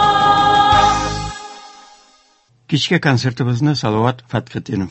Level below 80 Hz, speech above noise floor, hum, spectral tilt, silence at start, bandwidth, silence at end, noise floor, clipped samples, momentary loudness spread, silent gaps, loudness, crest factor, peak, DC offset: -38 dBFS; 38 dB; none; -5 dB/octave; 0 s; 8.4 kHz; 0 s; -55 dBFS; under 0.1%; 13 LU; none; -15 LUFS; 16 dB; 0 dBFS; under 0.1%